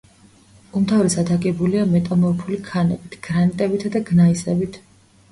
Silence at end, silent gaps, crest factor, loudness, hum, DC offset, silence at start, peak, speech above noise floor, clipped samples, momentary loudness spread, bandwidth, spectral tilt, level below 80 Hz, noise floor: 0.55 s; none; 14 dB; -19 LUFS; none; under 0.1%; 0.75 s; -6 dBFS; 32 dB; under 0.1%; 9 LU; 11.5 kHz; -7 dB/octave; -50 dBFS; -50 dBFS